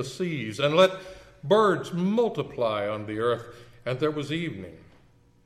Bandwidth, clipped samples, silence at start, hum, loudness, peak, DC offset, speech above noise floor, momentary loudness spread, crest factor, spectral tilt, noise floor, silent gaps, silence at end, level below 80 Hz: 14 kHz; under 0.1%; 0 s; none; -26 LUFS; -8 dBFS; under 0.1%; 32 dB; 19 LU; 20 dB; -6 dB/octave; -58 dBFS; none; 0.65 s; -62 dBFS